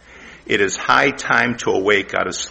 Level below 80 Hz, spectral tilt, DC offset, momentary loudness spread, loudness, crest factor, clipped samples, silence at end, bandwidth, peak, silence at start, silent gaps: -50 dBFS; -3 dB/octave; under 0.1%; 7 LU; -17 LUFS; 18 dB; under 0.1%; 0 s; 8.6 kHz; 0 dBFS; 0.1 s; none